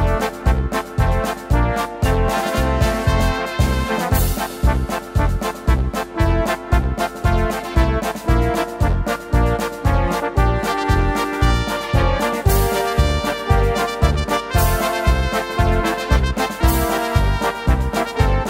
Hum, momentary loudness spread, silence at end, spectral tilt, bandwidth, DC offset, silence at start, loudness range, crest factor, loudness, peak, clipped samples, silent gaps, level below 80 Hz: none; 3 LU; 0 s; -5.5 dB/octave; 16 kHz; under 0.1%; 0 s; 2 LU; 16 dB; -19 LUFS; -2 dBFS; under 0.1%; none; -22 dBFS